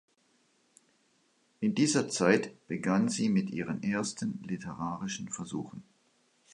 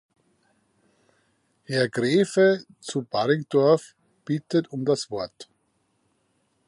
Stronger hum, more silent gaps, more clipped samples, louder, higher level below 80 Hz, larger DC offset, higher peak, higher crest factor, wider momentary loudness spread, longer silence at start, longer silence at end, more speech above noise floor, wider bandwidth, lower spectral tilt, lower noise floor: neither; neither; neither; second, -31 LUFS vs -24 LUFS; about the same, -68 dBFS vs -70 dBFS; neither; second, -10 dBFS vs -6 dBFS; first, 24 dB vs 18 dB; about the same, 12 LU vs 12 LU; about the same, 1.6 s vs 1.7 s; second, 0.7 s vs 1.25 s; second, 40 dB vs 47 dB; about the same, 11.5 kHz vs 11.5 kHz; about the same, -5 dB/octave vs -5.5 dB/octave; about the same, -71 dBFS vs -71 dBFS